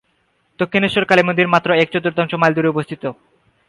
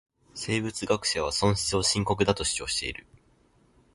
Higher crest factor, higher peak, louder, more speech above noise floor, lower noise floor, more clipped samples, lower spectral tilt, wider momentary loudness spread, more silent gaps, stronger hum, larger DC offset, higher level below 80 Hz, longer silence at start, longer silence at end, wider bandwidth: about the same, 18 dB vs 20 dB; first, 0 dBFS vs -8 dBFS; first, -16 LUFS vs -27 LUFS; first, 47 dB vs 36 dB; about the same, -63 dBFS vs -63 dBFS; neither; first, -6.5 dB/octave vs -3.5 dB/octave; about the same, 11 LU vs 11 LU; neither; neither; neither; second, -58 dBFS vs -48 dBFS; first, 0.6 s vs 0.35 s; second, 0.55 s vs 0.95 s; about the same, 11.5 kHz vs 11.5 kHz